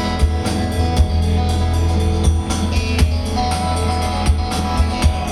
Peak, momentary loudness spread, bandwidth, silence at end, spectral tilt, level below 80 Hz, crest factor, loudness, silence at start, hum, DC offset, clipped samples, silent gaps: -2 dBFS; 2 LU; 12.5 kHz; 0 s; -5.5 dB/octave; -20 dBFS; 14 dB; -18 LUFS; 0 s; none; under 0.1%; under 0.1%; none